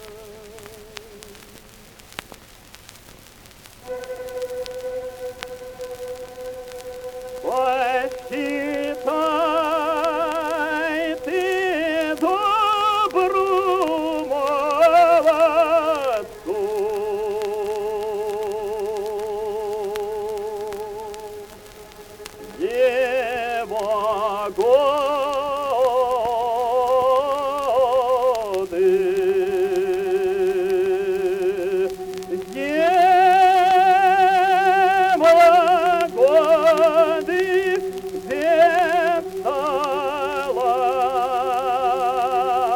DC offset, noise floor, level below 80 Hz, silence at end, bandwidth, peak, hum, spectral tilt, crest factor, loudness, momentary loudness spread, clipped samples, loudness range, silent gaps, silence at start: under 0.1%; -45 dBFS; -54 dBFS; 0 s; 19 kHz; -4 dBFS; none; -4 dB/octave; 16 dB; -20 LUFS; 18 LU; under 0.1%; 15 LU; none; 0 s